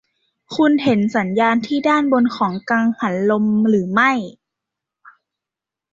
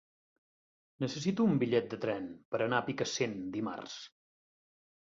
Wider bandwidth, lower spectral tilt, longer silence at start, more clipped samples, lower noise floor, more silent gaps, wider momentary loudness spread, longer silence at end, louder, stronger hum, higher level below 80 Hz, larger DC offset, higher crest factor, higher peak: about the same, 7.6 kHz vs 7.8 kHz; about the same, -6.5 dB/octave vs -5.5 dB/octave; second, 0.5 s vs 1 s; neither; about the same, -87 dBFS vs under -90 dBFS; second, none vs 2.45-2.52 s; second, 4 LU vs 13 LU; first, 1.6 s vs 0.95 s; first, -17 LUFS vs -34 LUFS; neither; first, -62 dBFS vs -72 dBFS; neither; about the same, 16 dB vs 20 dB; first, -2 dBFS vs -14 dBFS